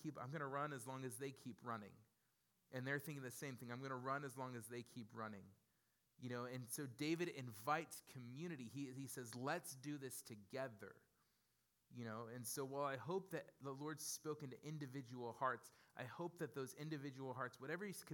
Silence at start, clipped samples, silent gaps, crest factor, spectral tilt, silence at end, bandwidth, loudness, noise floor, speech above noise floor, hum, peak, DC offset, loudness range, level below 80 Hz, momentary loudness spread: 0 s; under 0.1%; none; 24 dB; -4.5 dB/octave; 0 s; 18 kHz; -49 LUFS; -85 dBFS; 35 dB; none; -26 dBFS; under 0.1%; 3 LU; under -90 dBFS; 9 LU